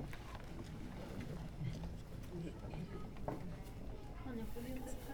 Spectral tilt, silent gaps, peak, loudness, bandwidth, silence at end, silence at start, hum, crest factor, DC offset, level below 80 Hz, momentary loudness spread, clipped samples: -6.5 dB/octave; none; -28 dBFS; -49 LUFS; 19.5 kHz; 0 s; 0 s; none; 18 dB; under 0.1%; -52 dBFS; 5 LU; under 0.1%